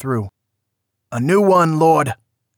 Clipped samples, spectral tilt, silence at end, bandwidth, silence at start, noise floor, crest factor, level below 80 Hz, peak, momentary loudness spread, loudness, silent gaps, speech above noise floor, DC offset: under 0.1%; -7 dB/octave; 0.45 s; 19 kHz; 0 s; -76 dBFS; 14 dB; -60 dBFS; -4 dBFS; 18 LU; -16 LUFS; none; 61 dB; under 0.1%